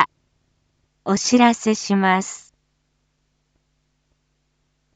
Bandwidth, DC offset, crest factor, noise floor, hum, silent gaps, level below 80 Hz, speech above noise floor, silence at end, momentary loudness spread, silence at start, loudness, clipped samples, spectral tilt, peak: 9.2 kHz; under 0.1%; 22 dB; -69 dBFS; none; none; -64 dBFS; 51 dB; 2.6 s; 17 LU; 0 s; -19 LUFS; under 0.1%; -4 dB/octave; 0 dBFS